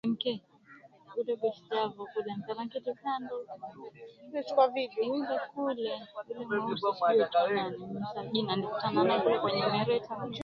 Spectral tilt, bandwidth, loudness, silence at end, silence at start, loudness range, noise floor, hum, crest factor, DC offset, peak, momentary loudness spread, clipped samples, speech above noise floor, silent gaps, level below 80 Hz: -7 dB/octave; 7 kHz; -32 LUFS; 0 s; 0.05 s; 7 LU; -57 dBFS; none; 20 dB; under 0.1%; -12 dBFS; 14 LU; under 0.1%; 25 dB; none; -74 dBFS